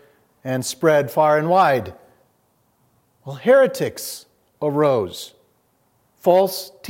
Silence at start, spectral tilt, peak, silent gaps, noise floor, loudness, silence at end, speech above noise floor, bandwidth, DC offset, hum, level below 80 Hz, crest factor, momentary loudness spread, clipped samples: 0.45 s; -5 dB/octave; -4 dBFS; none; -63 dBFS; -19 LUFS; 0 s; 45 dB; 16.5 kHz; under 0.1%; none; -68 dBFS; 18 dB; 20 LU; under 0.1%